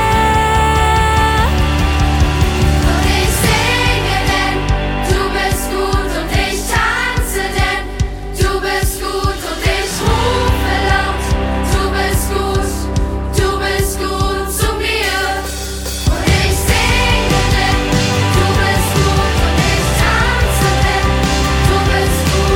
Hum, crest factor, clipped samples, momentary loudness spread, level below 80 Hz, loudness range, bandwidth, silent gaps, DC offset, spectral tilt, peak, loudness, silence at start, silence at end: none; 14 dB; under 0.1%; 5 LU; -18 dBFS; 3 LU; 17.5 kHz; none; under 0.1%; -4.5 dB/octave; 0 dBFS; -14 LUFS; 0 s; 0 s